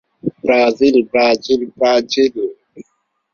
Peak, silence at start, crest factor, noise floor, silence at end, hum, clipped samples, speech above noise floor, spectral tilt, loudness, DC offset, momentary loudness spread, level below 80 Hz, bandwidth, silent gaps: 0 dBFS; 0.25 s; 16 dB; -66 dBFS; 0.5 s; none; under 0.1%; 53 dB; -4.5 dB/octave; -15 LUFS; under 0.1%; 11 LU; -54 dBFS; 7.2 kHz; none